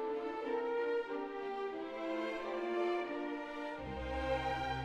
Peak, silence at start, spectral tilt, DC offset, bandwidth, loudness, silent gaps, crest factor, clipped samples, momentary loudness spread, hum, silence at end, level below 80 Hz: -24 dBFS; 0 s; -6.5 dB/octave; under 0.1%; 11 kHz; -39 LUFS; none; 14 dB; under 0.1%; 6 LU; none; 0 s; -54 dBFS